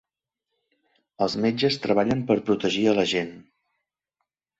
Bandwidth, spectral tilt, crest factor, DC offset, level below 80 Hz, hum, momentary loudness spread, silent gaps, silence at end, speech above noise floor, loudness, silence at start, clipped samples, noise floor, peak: 8 kHz; -5.5 dB/octave; 20 dB; under 0.1%; -60 dBFS; none; 6 LU; none; 1.2 s; 61 dB; -23 LUFS; 1.2 s; under 0.1%; -84 dBFS; -6 dBFS